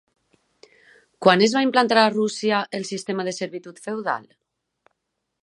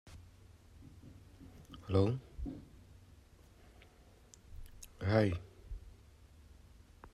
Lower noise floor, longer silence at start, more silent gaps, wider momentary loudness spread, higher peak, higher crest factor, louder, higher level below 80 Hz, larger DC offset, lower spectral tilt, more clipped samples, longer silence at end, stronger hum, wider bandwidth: first, -79 dBFS vs -62 dBFS; first, 1.2 s vs 0.05 s; neither; second, 14 LU vs 28 LU; first, 0 dBFS vs -18 dBFS; about the same, 22 dB vs 24 dB; first, -21 LUFS vs -36 LUFS; second, -74 dBFS vs -56 dBFS; neither; second, -4 dB/octave vs -7.5 dB/octave; neither; first, 1.25 s vs 0.05 s; neither; second, 11.5 kHz vs 13 kHz